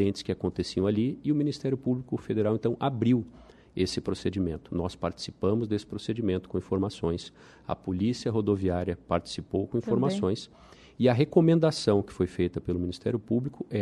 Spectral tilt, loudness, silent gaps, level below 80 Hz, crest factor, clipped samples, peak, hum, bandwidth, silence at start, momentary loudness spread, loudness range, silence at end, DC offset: -7 dB/octave; -29 LUFS; none; -54 dBFS; 20 dB; under 0.1%; -8 dBFS; none; 11.5 kHz; 0 s; 9 LU; 5 LU; 0 s; under 0.1%